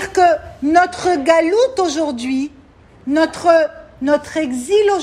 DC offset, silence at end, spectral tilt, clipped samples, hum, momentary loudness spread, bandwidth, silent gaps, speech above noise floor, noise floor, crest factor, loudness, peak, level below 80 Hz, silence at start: under 0.1%; 0 s; -3.5 dB/octave; under 0.1%; none; 9 LU; 13 kHz; none; 30 dB; -45 dBFS; 14 dB; -16 LUFS; 0 dBFS; -48 dBFS; 0 s